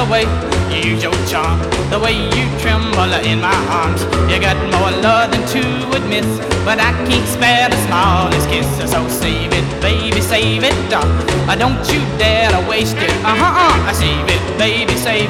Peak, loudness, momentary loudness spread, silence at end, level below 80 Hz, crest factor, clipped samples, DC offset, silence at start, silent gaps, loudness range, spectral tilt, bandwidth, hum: -2 dBFS; -14 LUFS; 4 LU; 0 s; -26 dBFS; 12 dB; under 0.1%; under 0.1%; 0 s; none; 2 LU; -4.5 dB/octave; 16.5 kHz; none